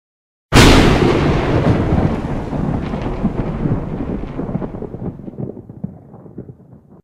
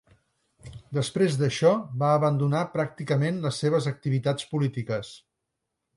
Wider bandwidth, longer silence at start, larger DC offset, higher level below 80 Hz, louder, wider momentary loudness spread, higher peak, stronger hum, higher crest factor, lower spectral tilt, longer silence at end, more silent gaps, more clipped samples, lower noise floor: first, 16.5 kHz vs 11.5 kHz; second, 0.5 s vs 0.65 s; neither; first, -24 dBFS vs -62 dBFS; first, -16 LUFS vs -26 LUFS; first, 21 LU vs 10 LU; first, 0 dBFS vs -8 dBFS; neither; about the same, 16 dB vs 18 dB; about the same, -5.5 dB/octave vs -6.5 dB/octave; second, 0.55 s vs 0.8 s; neither; neither; second, -43 dBFS vs -82 dBFS